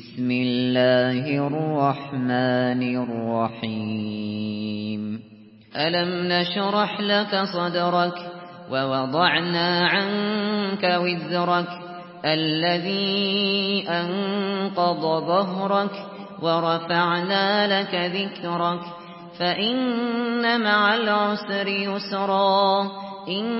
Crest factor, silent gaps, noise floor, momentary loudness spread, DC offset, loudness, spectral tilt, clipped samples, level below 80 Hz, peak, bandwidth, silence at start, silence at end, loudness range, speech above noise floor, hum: 16 dB; none; -48 dBFS; 9 LU; under 0.1%; -23 LUFS; -10 dB/octave; under 0.1%; -68 dBFS; -6 dBFS; 5.8 kHz; 0 s; 0 s; 4 LU; 25 dB; none